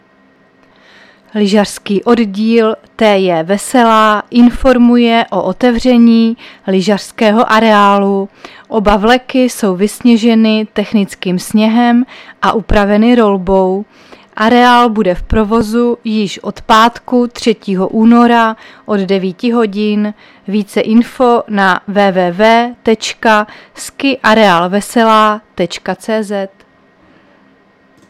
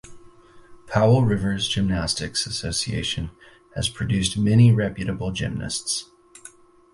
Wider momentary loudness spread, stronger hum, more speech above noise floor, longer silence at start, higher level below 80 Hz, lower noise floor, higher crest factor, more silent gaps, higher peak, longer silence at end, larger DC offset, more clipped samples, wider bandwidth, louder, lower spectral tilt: about the same, 10 LU vs 10 LU; neither; first, 37 dB vs 27 dB; first, 1.35 s vs 0.05 s; first, -32 dBFS vs -42 dBFS; about the same, -48 dBFS vs -48 dBFS; second, 10 dB vs 18 dB; neither; first, 0 dBFS vs -4 dBFS; first, 1.65 s vs 0.45 s; neither; neither; first, 14 kHz vs 11.5 kHz; first, -11 LUFS vs -22 LUFS; about the same, -5.5 dB/octave vs -5 dB/octave